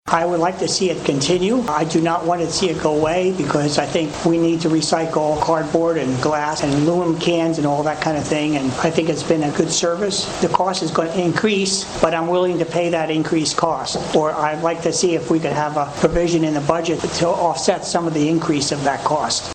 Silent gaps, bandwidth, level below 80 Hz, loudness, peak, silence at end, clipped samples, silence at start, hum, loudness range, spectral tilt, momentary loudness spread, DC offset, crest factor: none; 9.6 kHz; -44 dBFS; -18 LUFS; -2 dBFS; 0 s; under 0.1%; 0.05 s; none; 1 LU; -4.5 dB/octave; 2 LU; under 0.1%; 16 dB